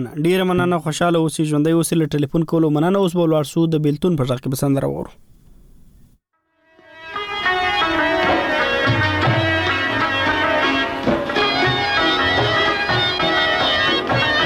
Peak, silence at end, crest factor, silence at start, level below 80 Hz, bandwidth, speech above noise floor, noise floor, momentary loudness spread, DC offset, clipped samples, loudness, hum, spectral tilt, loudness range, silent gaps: -6 dBFS; 0 s; 12 dB; 0 s; -44 dBFS; 17.5 kHz; 47 dB; -65 dBFS; 4 LU; under 0.1%; under 0.1%; -17 LUFS; none; -5 dB/octave; 7 LU; none